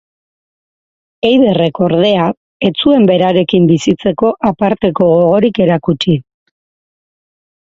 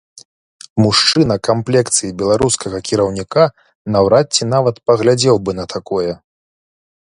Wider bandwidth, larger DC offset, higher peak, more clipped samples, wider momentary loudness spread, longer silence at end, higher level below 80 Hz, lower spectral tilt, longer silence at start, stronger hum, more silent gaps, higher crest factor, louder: second, 7.8 kHz vs 11 kHz; neither; about the same, 0 dBFS vs 0 dBFS; neither; second, 6 LU vs 9 LU; first, 1.55 s vs 1.05 s; about the same, -48 dBFS vs -44 dBFS; first, -7 dB/octave vs -4.5 dB/octave; first, 1.25 s vs 0.75 s; neither; first, 2.37-2.60 s vs 3.75-3.85 s; about the same, 12 dB vs 16 dB; first, -11 LUFS vs -15 LUFS